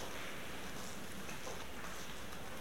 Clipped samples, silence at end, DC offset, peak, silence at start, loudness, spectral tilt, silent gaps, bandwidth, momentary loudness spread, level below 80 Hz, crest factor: under 0.1%; 0 s; 0.6%; -30 dBFS; 0 s; -47 LUFS; -3 dB/octave; none; 16.5 kHz; 2 LU; -60 dBFS; 16 dB